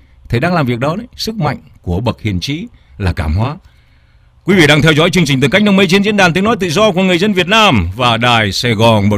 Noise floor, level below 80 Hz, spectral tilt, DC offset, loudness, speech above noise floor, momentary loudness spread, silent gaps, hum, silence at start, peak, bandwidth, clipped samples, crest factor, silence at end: -47 dBFS; -32 dBFS; -5.5 dB/octave; under 0.1%; -12 LUFS; 35 dB; 12 LU; none; none; 0.3 s; 0 dBFS; 16 kHz; under 0.1%; 12 dB; 0 s